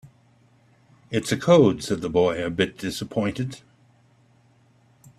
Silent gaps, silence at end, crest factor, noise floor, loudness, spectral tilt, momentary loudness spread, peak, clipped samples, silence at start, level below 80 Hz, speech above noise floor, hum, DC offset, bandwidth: none; 1.6 s; 20 dB; -59 dBFS; -23 LUFS; -6 dB/octave; 14 LU; -4 dBFS; under 0.1%; 0.05 s; -56 dBFS; 37 dB; none; under 0.1%; 14 kHz